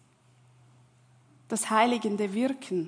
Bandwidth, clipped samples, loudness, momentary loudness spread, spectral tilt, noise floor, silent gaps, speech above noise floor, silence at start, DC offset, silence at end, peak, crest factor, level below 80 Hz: 10.5 kHz; under 0.1%; -27 LUFS; 7 LU; -4 dB/octave; -61 dBFS; none; 34 dB; 1.5 s; under 0.1%; 0 s; -10 dBFS; 22 dB; -82 dBFS